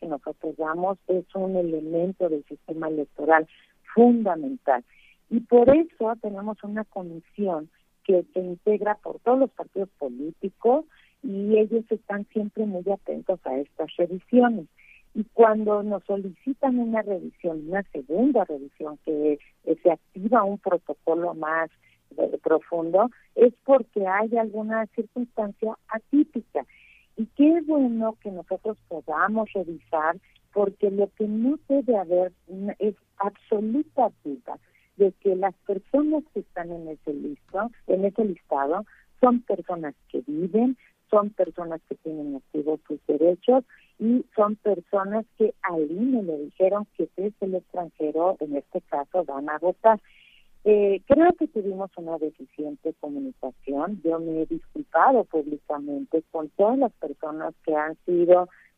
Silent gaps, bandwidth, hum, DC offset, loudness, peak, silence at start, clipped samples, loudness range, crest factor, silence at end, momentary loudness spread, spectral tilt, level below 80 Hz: none; 3.8 kHz; none; under 0.1%; -25 LUFS; -4 dBFS; 0 s; under 0.1%; 4 LU; 20 dB; 0.3 s; 13 LU; -9.5 dB/octave; -62 dBFS